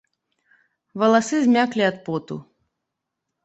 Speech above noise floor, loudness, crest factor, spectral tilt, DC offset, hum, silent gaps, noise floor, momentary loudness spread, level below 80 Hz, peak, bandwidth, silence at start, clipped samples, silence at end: 62 dB; -20 LUFS; 20 dB; -5 dB/octave; under 0.1%; none; none; -81 dBFS; 18 LU; -68 dBFS; -4 dBFS; 8.2 kHz; 0.95 s; under 0.1%; 1.05 s